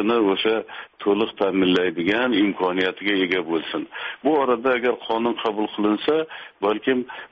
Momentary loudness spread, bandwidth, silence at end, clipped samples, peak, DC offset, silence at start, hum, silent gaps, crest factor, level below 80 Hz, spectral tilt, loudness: 7 LU; 7.2 kHz; 0.05 s; under 0.1%; -6 dBFS; under 0.1%; 0 s; none; none; 16 dB; -62 dBFS; -2.5 dB/octave; -22 LUFS